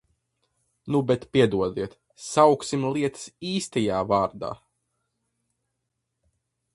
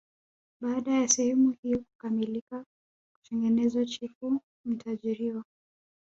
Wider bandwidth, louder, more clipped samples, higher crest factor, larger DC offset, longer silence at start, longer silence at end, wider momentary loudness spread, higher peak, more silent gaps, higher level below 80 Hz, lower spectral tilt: first, 11.5 kHz vs 8 kHz; first, -24 LUFS vs -29 LUFS; neither; about the same, 22 dB vs 22 dB; neither; first, 0.85 s vs 0.6 s; first, 2.2 s vs 0.6 s; first, 16 LU vs 13 LU; first, -4 dBFS vs -8 dBFS; second, none vs 1.58-1.63 s, 1.95-1.99 s, 2.41-2.47 s, 2.66-3.22 s, 4.15-4.21 s, 4.43-4.64 s; first, -58 dBFS vs -68 dBFS; first, -5.5 dB/octave vs -3.5 dB/octave